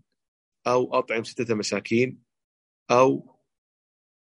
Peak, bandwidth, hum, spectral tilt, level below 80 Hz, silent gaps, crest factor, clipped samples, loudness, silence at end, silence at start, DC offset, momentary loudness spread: -6 dBFS; 11 kHz; none; -5 dB/octave; -72 dBFS; 2.44-2.86 s; 20 dB; under 0.1%; -24 LUFS; 1.15 s; 0.65 s; under 0.1%; 9 LU